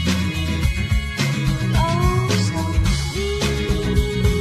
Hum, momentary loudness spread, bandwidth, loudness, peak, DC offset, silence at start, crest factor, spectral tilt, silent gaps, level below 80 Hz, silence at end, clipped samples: none; 4 LU; 14 kHz; -20 LUFS; -4 dBFS; under 0.1%; 0 s; 14 dB; -5.5 dB/octave; none; -24 dBFS; 0 s; under 0.1%